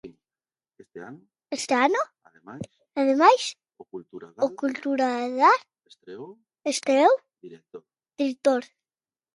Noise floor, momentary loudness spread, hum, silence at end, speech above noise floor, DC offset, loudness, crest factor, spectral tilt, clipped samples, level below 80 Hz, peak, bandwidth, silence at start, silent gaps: under -90 dBFS; 24 LU; none; 0.7 s; over 66 dB; under 0.1%; -23 LUFS; 22 dB; -3 dB/octave; under 0.1%; -76 dBFS; -4 dBFS; 11.5 kHz; 0.05 s; none